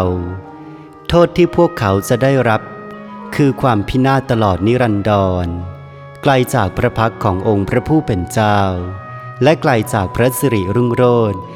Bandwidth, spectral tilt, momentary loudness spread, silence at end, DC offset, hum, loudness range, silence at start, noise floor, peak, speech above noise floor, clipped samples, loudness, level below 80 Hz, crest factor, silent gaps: 17.5 kHz; -6.5 dB/octave; 17 LU; 0 s; under 0.1%; none; 1 LU; 0 s; -35 dBFS; 0 dBFS; 21 dB; under 0.1%; -15 LUFS; -38 dBFS; 14 dB; none